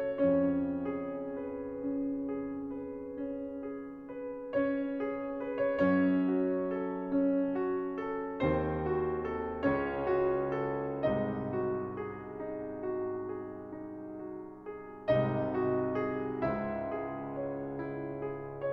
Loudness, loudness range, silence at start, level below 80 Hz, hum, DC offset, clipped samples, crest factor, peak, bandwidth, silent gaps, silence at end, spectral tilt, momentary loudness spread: -34 LUFS; 7 LU; 0 s; -56 dBFS; none; under 0.1%; under 0.1%; 16 dB; -16 dBFS; 4.8 kHz; none; 0 s; -10 dB/octave; 12 LU